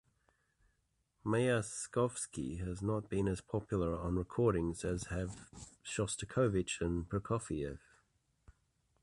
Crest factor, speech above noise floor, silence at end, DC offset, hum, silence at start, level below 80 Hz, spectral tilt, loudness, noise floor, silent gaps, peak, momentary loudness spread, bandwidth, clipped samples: 18 dB; 43 dB; 1.25 s; under 0.1%; none; 1.25 s; -52 dBFS; -5.5 dB/octave; -37 LUFS; -80 dBFS; none; -20 dBFS; 10 LU; 11.5 kHz; under 0.1%